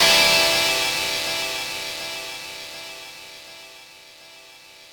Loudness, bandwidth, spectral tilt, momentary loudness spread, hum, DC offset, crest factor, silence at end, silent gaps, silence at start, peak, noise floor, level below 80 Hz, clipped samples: -19 LUFS; over 20 kHz; 0 dB/octave; 25 LU; none; under 0.1%; 20 dB; 0.05 s; none; 0 s; -4 dBFS; -46 dBFS; -54 dBFS; under 0.1%